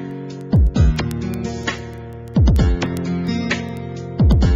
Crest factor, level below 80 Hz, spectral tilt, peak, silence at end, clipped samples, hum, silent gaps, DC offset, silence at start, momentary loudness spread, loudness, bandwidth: 14 dB; -22 dBFS; -7 dB/octave; -4 dBFS; 0 s; under 0.1%; none; none; under 0.1%; 0 s; 14 LU; -19 LUFS; 13.5 kHz